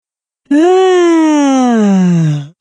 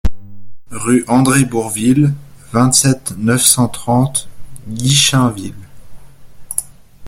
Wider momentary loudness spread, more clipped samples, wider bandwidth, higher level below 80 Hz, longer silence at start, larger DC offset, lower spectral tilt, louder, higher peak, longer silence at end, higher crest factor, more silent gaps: second, 5 LU vs 14 LU; neither; second, 10 kHz vs 16.5 kHz; second, -64 dBFS vs -34 dBFS; first, 0.5 s vs 0.05 s; neither; first, -6.5 dB/octave vs -4 dB/octave; first, -10 LUFS vs -13 LUFS; about the same, 0 dBFS vs 0 dBFS; about the same, 0.1 s vs 0 s; about the same, 10 dB vs 14 dB; neither